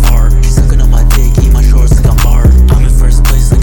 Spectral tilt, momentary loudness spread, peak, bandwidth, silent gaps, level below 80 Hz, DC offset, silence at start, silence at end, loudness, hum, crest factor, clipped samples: -6 dB/octave; 3 LU; 0 dBFS; 19 kHz; none; -6 dBFS; under 0.1%; 0 s; 0 s; -9 LUFS; none; 4 dB; 0.3%